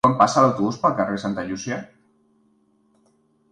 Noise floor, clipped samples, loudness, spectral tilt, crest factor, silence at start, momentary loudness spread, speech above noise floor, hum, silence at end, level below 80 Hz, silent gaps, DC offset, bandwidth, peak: -62 dBFS; under 0.1%; -21 LUFS; -5.5 dB/octave; 22 dB; 0.05 s; 13 LU; 42 dB; none; 1.65 s; -56 dBFS; none; under 0.1%; 11 kHz; -2 dBFS